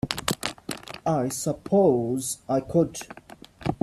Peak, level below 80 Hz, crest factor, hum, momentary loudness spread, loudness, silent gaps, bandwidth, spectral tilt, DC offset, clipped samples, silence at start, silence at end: -2 dBFS; -54 dBFS; 24 dB; none; 15 LU; -26 LUFS; none; 15.5 kHz; -5 dB/octave; under 0.1%; under 0.1%; 0.05 s; 0.1 s